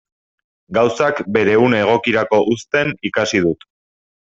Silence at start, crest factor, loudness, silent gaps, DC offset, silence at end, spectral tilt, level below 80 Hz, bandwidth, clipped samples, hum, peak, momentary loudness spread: 0.7 s; 16 dB; -16 LUFS; none; under 0.1%; 0.85 s; -5 dB/octave; -54 dBFS; 7.8 kHz; under 0.1%; none; 0 dBFS; 6 LU